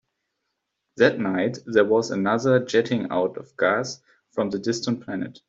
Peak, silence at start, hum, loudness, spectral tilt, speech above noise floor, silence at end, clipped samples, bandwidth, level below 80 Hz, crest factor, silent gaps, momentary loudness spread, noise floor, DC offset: -4 dBFS; 0.95 s; none; -23 LUFS; -5.5 dB/octave; 56 dB; 0.2 s; under 0.1%; 7.8 kHz; -66 dBFS; 20 dB; none; 9 LU; -79 dBFS; under 0.1%